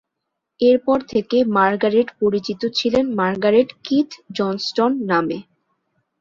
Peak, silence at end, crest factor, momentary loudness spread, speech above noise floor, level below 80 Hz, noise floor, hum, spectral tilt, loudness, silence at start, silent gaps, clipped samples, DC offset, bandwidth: -2 dBFS; 0.8 s; 16 dB; 7 LU; 61 dB; -58 dBFS; -79 dBFS; none; -6 dB/octave; -19 LUFS; 0.6 s; none; under 0.1%; under 0.1%; 7.4 kHz